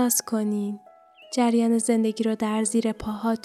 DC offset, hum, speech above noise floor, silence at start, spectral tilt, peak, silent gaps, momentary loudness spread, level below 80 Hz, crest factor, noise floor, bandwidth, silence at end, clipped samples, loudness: under 0.1%; none; 22 dB; 0 s; -4.5 dB/octave; -10 dBFS; none; 8 LU; -56 dBFS; 14 dB; -46 dBFS; 15 kHz; 0.05 s; under 0.1%; -24 LUFS